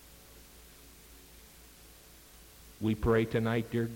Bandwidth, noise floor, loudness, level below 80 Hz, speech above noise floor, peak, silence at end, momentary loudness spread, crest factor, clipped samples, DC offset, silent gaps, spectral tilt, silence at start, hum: 17 kHz; -55 dBFS; -31 LUFS; -52 dBFS; 26 dB; -16 dBFS; 0 s; 25 LU; 18 dB; under 0.1%; under 0.1%; none; -7 dB/octave; 0.1 s; none